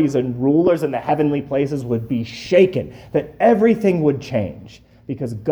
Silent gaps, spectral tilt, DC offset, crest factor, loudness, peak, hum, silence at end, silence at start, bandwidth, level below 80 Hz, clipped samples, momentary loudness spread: none; -8 dB/octave; under 0.1%; 16 dB; -18 LUFS; -2 dBFS; none; 0 s; 0 s; over 20 kHz; -50 dBFS; under 0.1%; 10 LU